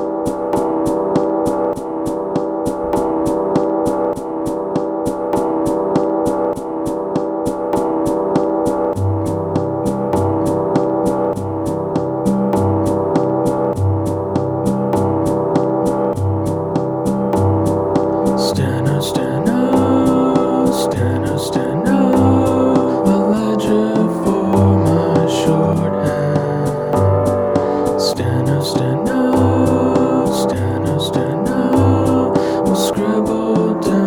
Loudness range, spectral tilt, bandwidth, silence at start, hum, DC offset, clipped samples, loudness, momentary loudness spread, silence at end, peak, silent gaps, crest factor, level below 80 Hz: 4 LU; -7 dB/octave; 19 kHz; 0 s; none; under 0.1%; under 0.1%; -16 LUFS; 6 LU; 0 s; -2 dBFS; none; 12 dB; -42 dBFS